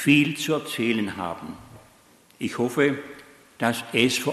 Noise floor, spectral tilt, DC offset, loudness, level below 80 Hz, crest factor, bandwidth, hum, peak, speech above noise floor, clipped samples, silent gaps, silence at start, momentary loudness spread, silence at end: -56 dBFS; -4.5 dB/octave; under 0.1%; -24 LUFS; -62 dBFS; 20 dB; 13 kHz; none; -4 dBFS; 32 dB; under 0.1%; none; 0 s; 18 LU; 0 s